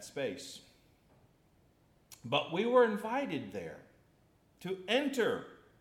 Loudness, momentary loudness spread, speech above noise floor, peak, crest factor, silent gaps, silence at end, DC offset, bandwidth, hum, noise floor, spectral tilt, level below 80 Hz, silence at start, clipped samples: -33 LUFS; 21 LU; 35 dB; -16 dBFS; 20 dB; none; 0.25 s; under 0.1%; 15.5 kHz; none; -68 dBFS; -4.5 dB/octave; -76 dBFS; 0 s; under 0.1%